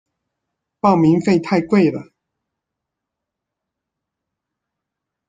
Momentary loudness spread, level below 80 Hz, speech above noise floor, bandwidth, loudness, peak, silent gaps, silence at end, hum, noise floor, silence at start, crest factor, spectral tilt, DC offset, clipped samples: 5 LU; -60 dBFS; 67 dB; 8.8 kHz; -16 LUFS; -2 dBFS; none; 3.25 s; none; -82 dBFS; 0.85 s; 20 dB; -8 dB/octave; under 0.1%; under 0.1%